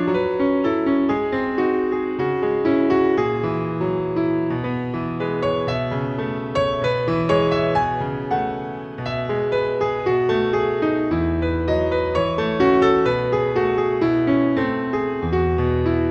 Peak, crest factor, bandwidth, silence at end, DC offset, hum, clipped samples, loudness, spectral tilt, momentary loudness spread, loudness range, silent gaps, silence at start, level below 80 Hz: -4 dBFS; 16 dB; 7.6 kHz; 0 s; under 0.1%; none; under 0.1%; -21 LUFS; -8 dB/octave; 6 LU; 3 LU; none; 0 s; -42 dBFS